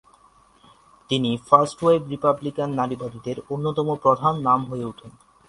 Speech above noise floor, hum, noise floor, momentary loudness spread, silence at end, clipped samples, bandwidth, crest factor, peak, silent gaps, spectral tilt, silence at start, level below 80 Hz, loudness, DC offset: 34 dB; none; -56 dBFS; 13 LU; 0.4 s; under 0.1%; 11.5 kHz; 22 dB; 0 dBFS; none; -6.5 dB/octave; 1.1 s; -58 dBFS; -22 LUFS; under 0.1%